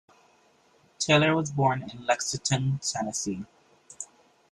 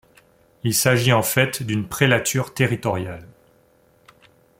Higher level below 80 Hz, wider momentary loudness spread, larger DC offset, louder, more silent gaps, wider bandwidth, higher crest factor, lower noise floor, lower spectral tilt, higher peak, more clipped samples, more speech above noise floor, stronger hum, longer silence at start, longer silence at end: second, -62 dBFS vs -54 dBFS; first, 20 LU vs 11 LU; neither; second, -26 LUFS vs -20 LUFS; neither; second, 12 kHz vs 16.5 kHz; about the same, 20 dB vs 20 dB; first, -63 dBFS vs -58 dBFS; about the same, -4 dB/octave vs -4 dB/octave; second, -8 dBFS vs -2 dBFS; neither; about the same, 36 dB vs 38 dB; neither; first, 1 s vs 0.65 s; second, 0.45 s vs 1.35 s